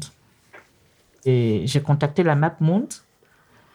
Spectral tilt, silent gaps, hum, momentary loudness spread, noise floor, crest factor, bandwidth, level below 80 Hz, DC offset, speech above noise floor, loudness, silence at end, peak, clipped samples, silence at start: -7 dB/octave; none; none; 13 LU; -59 dBFS; 18 dB; 12 kHz; -58 dBFS; under 0.1%; 39 dB; -21 LUFS; 0.75 s; -4 dBFS; under 0.1%; 0 s